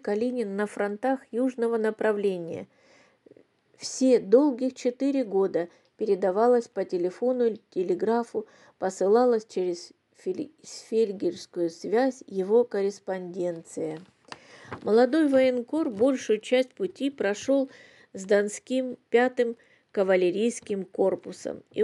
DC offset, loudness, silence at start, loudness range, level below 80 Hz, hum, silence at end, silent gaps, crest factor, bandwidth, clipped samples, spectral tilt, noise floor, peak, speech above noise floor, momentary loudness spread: under 0.1%; -26 LUFS; 0.05 s; 4 LU; -80 dBFS; none; 0 s; none; 18 dB; 11.5 kHz; under 0.1%; -5 dB/octave; -58 dBFS; -8 dBFS; 32 dB; 14 LU